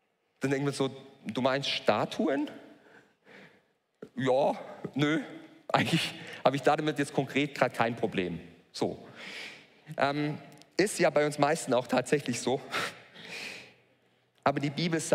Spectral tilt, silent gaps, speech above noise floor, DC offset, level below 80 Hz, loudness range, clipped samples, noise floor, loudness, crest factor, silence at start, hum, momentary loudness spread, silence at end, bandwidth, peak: -5 dB/octave; none; 39 dB; under 0.1%; -72 dBFS; 4 LU; under 0.1%; -69 dBFS; -30 LUFS; 22 dB; 0.4 s; none; 16 LU; 0 s; 16 kHz; -10 dBFS